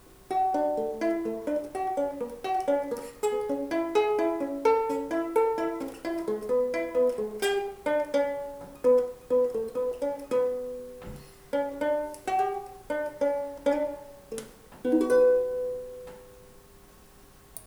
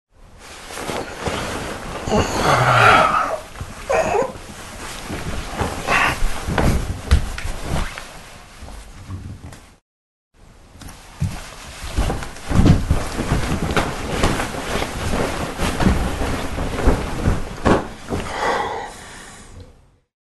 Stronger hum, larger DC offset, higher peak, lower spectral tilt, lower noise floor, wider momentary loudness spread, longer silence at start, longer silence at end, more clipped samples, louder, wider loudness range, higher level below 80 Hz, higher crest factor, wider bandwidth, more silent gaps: neither; neither; second, -10 dBFS vs 0 dBFS; about the same, -4.5 dB/octave vs -5 dB/octave; first, -53 dBFS vs -49 dBFS; second, 13 LU vs 21 LU; about the same, 0.1 s vs 0.2 s; second, 0.05 s vs 0.55 s; neither; second, -28 LUFS vs -20 LUFS; second, 3 LU vs 15 LU; second, -58 dBFS vs -28 dBFS; about the same, 18 dB vs 20 dB; first, over 20 kHz vs 12.5 kHz; second, none vs 9.82-10.31 s